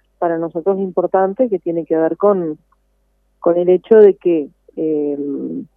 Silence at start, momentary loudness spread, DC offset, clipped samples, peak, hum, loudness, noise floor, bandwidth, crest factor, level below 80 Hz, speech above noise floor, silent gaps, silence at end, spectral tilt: 0.2 s; 13 LU; under 0.1%; under 0.1%; 0 dBFS; 50 Hz at -45 dBFS; -16 LUFS; -61 dBFS; 3.5 kHz; 16 dB; -62 dBFS; 46 dB; none; 0.15 s; -11 dB/octave